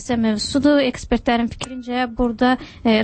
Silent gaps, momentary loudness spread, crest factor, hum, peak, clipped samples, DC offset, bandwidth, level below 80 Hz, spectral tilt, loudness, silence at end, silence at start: none; 8 LU; 14 dB; none; -4 dBFS; under 0.1%; under 0.1%; 8.8 kHz; -38 dBFS; -4.5 dB/octave; -19 LUFS; 0 s; 0 s